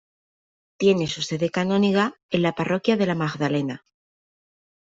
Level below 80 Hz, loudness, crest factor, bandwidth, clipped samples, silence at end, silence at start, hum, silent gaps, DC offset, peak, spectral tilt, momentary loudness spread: -62 dBFS; -23 LUFS; 18 dB; 7.8 kHz; under 0.1%; 1.1 s; 0.8 s; none; 2.23-2.29 s; under 0.1%; -6 dBFS; -6 dB/octave; 6 LU